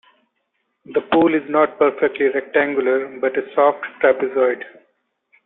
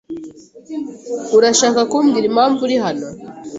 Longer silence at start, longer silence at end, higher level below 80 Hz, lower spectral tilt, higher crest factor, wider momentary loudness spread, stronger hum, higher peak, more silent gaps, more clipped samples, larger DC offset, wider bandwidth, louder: first, 0.9 s vs 0.1 s; first, 0.75 s vs 0 s; about the same, -64 dBFS vs -60 dBFS; first, -10 dB/octave vs -3 dB/octave; about the same, 16 dB vs 16 dB; second, 6 LU vs 18 LU; neither; about the same, -2 dBFS vs -2 dBFS; neither; neither; neither; second, 4.1 kHz vs 8.2 kHz; second, -18 LUFS vs -15 LUFS